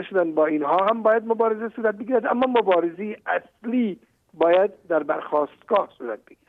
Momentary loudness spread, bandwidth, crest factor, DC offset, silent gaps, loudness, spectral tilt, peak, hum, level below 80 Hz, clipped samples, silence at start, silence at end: 9 LU; 4.4 kHz; 14 dB; under 0.1%; none; -22 LUFS; -8 dB/octave; -8 dBFS; none; -72 dBFS; under 0.1%; 0 s; 0.3 s